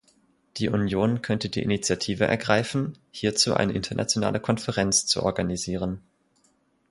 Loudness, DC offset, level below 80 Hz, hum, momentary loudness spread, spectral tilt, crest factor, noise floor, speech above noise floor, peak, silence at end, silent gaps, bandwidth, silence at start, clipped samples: -25 LUFS; under 0.1%; -50 dBFS; none; 8 LU; -4 dB/octave; 22 dB; -66 dBFS; 41 dB; -4 dBFS; 0.9 s; none; 11.5 kHz; 0.55 s; under 0.1%